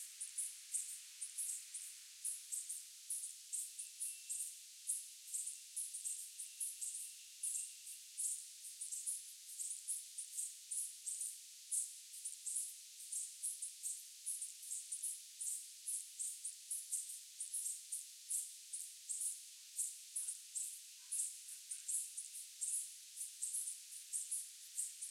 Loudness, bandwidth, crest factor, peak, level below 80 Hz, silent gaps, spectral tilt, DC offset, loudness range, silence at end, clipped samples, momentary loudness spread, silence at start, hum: -44 LUFS; 16.5 kHz; 22 dB; -24 dBFS; under -90 dBFS; none; 9.5 dB/octave; under 0.1%; 1 LU; 0 s; under 0.1%; 7 LU; 0 s; none